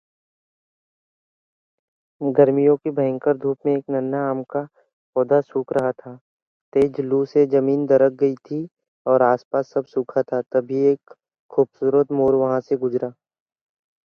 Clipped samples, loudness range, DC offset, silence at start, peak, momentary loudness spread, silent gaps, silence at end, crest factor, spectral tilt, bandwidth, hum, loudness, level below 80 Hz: under 0.1%; 3 LU; under 0.1%; 2.2 s; -2 dBFS; 10 LU; 4.93-5.13 s, 6.21-6.72 s, 8.88-9.05 s, 9.45-9.51 s, 11.39-11.49 s; 0.95 s; 20 dB; -9.5 dB/octave; 6.4 kHz; none; -21 LUFS; -64 dBFS